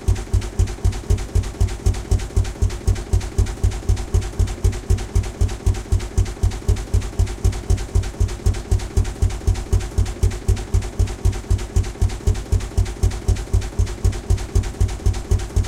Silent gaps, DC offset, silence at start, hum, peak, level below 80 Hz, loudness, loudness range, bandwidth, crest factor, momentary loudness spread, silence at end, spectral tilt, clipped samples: none; under 0.1%; 0 s; none; -6 dBFS; -22 dBFS; -23 LUFS; 0 LU; 14 kHz; 14 dB; 3 LU; 0 s; -6 dB/octave; under 0.1%